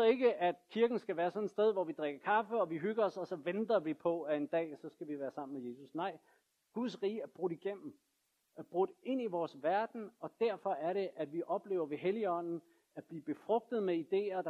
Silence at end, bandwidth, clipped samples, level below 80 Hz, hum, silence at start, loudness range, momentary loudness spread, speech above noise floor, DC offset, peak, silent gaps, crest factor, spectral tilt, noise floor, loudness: 0 s; 8 kHz; under 0.1%; under -90 dBFS; none; 0 s; 7 LU; 12 LU; 39 dB; under 0.1%; -18 dBFS; none; 18 dB; -7 dB/octave; -76 dBFS; -37 LUFS